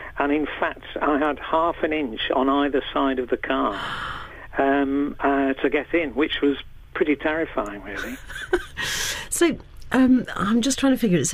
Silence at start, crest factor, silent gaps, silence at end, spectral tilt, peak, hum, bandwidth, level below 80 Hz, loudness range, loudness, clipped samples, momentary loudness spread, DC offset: 0 s; 16 dB; none; 0 s; -4 dB/octave; -8 dBFS; none; 15.5 kHz; -44 dBFS; 3 LU; -23 LUFS; under 0.1%; 10 LU; under 0.1%